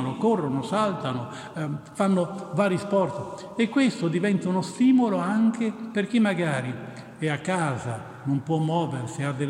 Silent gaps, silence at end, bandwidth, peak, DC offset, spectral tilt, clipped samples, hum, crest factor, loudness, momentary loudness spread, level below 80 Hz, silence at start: none; 0 s; 11.5 kHz; -10 dBFS; under 0.1%; -6.5 dB/octave; under 0.1%; none; 16 dB; -25 LUFS; 10 LU; -68 dBFS; 0 s